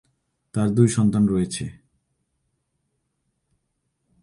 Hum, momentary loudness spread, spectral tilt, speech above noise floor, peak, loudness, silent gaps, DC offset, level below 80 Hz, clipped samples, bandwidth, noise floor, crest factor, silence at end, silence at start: none; 13 LU; -7 dB/octave; 55 dB; -4 dBFS; -21 LUFS; none; under 0.1%; -52 dBFS; under 0.1%; 11.5 kHz; -75 dBFS; 20 dB; 2.5 s; 0.55 s